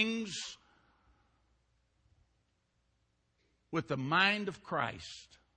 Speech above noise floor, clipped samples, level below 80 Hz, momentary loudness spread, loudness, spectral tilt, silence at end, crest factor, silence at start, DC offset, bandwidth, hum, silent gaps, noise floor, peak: 43 dB; under 0.1%; -72 dBFS; 20 LU; -33 LUFS; -4 dB/octave; 0.3 s; 26 dB; 0 s; under 0.1%; 9 kHz; none; none; -78 dBFS; -12 dBFS